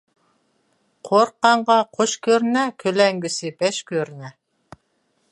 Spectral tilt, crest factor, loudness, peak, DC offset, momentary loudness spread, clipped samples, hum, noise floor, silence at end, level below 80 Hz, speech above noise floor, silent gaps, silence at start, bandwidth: -3.5 dB/octave; 20 dB; -19 LUFS; -2 dBFS; under 0.1%; 10 LU; under 0.1%; none; -68 dBFS; 1 s; -70 dBFS; 48 dB; none; 1.05 s; 11.5 kHz